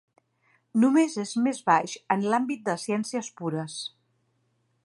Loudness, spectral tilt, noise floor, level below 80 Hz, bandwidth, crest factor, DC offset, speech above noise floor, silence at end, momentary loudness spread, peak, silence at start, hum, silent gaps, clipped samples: -26 LUFS; -5 dB/octave; -71 dBFS; -80 dBFS; 11.5 kHz; 20 dB; under 0.1%; 46 dB; 0.95 s; 11 LU; -8 dBFS; 0.75 s; none; none; under 0.1%